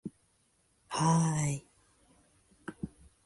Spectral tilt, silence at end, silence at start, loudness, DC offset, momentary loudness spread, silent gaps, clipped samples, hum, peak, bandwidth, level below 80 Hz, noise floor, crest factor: -5.5 dB/octave; 0.4 s; 0.05 s; -31 LUFS; under 0.1%; 21 LU; none; under 0.1%; none; -16 dBFS; 11.5 kHz; -62 dBFS; -72 dBFS; 20 dB